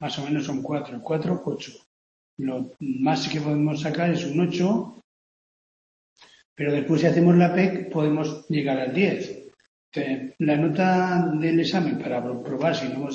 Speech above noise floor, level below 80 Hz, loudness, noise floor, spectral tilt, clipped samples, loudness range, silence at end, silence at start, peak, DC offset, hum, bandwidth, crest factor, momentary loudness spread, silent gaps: over 67 dB; -66 dBFS; -24 LUFS; under -90 dBFS; -7 dB/octave; under 0.1%; 5 LU; 0 s; 0 s; -6 dBFS; under 0.1%; none; 7.4 kHz; 18 dB; 10 LU; 1.86-2.37 s, 5.04-6.16 s, 6.45-6.56 s, 9.68-9.92 s